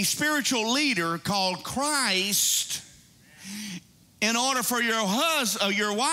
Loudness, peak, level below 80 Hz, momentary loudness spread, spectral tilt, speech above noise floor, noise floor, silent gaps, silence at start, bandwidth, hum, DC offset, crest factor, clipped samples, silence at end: -24 LUFS; -10 dBFS; -66 dBFS; 14 LU; -2 dB/octave; 28 dB; -54 dBFS; none; 0 s; 16 kHz; none; under 0.1%; 16 dB; under 0.1%; 0 s